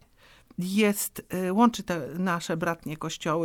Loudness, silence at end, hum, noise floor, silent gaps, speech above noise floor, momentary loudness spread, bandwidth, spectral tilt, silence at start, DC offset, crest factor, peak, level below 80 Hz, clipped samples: -27 LUFS; 0 s; none; -57 dBFS; none; 30 dB; 11 LU; 19 kHz; -5 dB/octave; 0.6 s; under 0.1%; 20 dB; -8 dBFS; -60 dBFS; under 0.1%